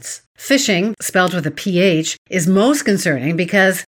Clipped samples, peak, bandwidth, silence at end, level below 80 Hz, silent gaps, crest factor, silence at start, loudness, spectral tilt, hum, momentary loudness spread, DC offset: under 0.1%; 0 dBFS; 18 kHz; 0.1 s; -60 dBFS; 0.26-0.35 s, 2.18-2.25 s; 16 dB; 0.05 s; -16 LUFS; -4.5 dB/octave; none; 6 LU; under 0.1%